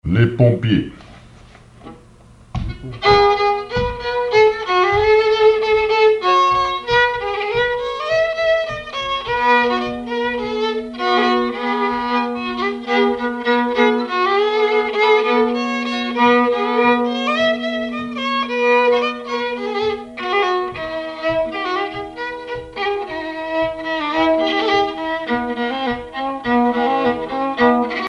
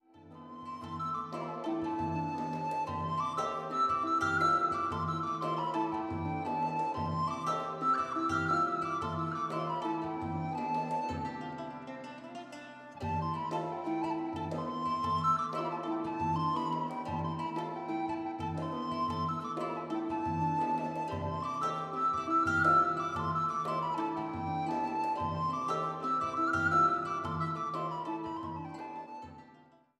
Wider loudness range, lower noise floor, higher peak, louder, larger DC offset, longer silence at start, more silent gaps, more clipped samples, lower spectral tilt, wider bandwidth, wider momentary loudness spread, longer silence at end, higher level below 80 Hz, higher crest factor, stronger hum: about the same, 6 LU vs 6 LU; second, -45 dBFS vs -61 dBFS; first, -2 dBFS vs -16 dBFS; first, -17 LUFS vs -33 LUFS; neither; about the same, 0.05 s vs 0.15 s; neither; neither; about the same, -6 dB/octave vs -6.5 dB/octave; second, 10 kHz vs 11.5 kHz; second, 9 LU vs 12 LU; second, 0 s vs 0.4 s; first, -42 dBFS vs -64 dBFS; about the same, 16 dB vs 18 dB; neither